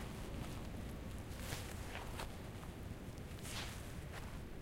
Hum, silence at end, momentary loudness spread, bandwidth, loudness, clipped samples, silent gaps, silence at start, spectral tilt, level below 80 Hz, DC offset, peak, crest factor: none; 0 s; 4 LU; 16.5 kHz; -48 LUFS; under 0.1%; none; 0 s; -4.5 dB/octave; -52 dBFS; under 0.1%; -26 dBFS; 22 dB